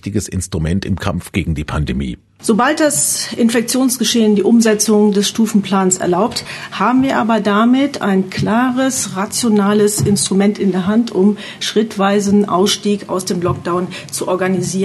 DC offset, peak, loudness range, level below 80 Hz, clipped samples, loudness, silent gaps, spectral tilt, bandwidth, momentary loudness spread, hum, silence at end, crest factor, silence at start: under 0.1%; -2 dBFS; 3 LU; -38 dBFS; under 0.1%; -15 LUFS; none; -4.5 dB/octave; 12.5 kHz; 8 LU; none; 0 s; 14 dB; 0.05 s